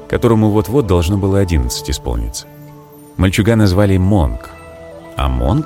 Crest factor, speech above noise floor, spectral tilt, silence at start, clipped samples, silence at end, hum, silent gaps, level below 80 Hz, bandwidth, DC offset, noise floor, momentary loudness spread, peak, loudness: 14 dB; 24 dB; -6.5 dB/octave; 0 s; under 0.1%; 0 s; none; none; -24 dBFS; 16.5 kHz; under 0.1%; -38 dBFS; 19 LU; 0 dBFS; -15 LUFS